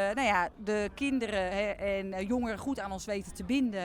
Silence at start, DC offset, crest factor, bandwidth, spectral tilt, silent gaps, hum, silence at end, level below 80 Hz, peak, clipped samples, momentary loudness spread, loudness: 0 s; under 0.1%; 18 dB; 15.5 kHz; -5 dB/octave; none; none; 0 s; -52 dBFS; -14 dBFS; under 0.1%; 8 LU; -32 LUFS